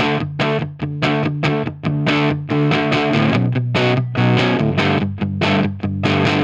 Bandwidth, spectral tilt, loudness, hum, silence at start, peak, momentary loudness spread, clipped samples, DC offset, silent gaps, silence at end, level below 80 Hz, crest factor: 8 kHz; -7 dB/octave; -18 LUFS; none; 0 s; 0 dBFS; 5 LU; under 0.1%; under 0.1%; none; 0 s; -48 dBFS; 16 dB